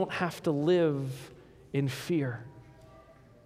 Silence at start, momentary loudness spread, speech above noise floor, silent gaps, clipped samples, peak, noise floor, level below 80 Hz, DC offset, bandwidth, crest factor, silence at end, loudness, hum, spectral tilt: 0 s; 18 LU; 26 dB; none; under 0.1%; -14 dBFS; -56 dBFS; -64 dBFS; under 0.1%; 15.5 kHz; 16 dB; 0.35 s; -30 LUFS; none; -7 dB/octave